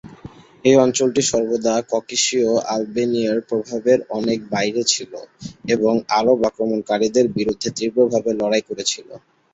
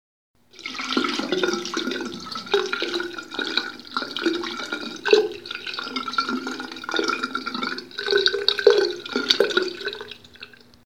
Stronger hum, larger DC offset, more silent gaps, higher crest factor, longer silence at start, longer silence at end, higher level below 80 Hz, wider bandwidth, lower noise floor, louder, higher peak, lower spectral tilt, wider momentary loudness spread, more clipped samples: neither; second, under 0.1% vs 0.2%; neither; second, 18 dB vs 26 dB; second, 0.05 s vs 0.55 s; about the same, 0.35 s vs 0.4 s; first, -56 dBFS vs -68 dBFS; second, 8.2 kHz vs 16 kHz; second, -41 dBFS vs -46 dBFS; first, -19 LUFS vs -24 LUFS; about the same, -2 dBFS vs 0 dBFS; about the same, -3.5 dB/octave vs -2.5 dB/octave; second, 7 LU vs 13 LU; neither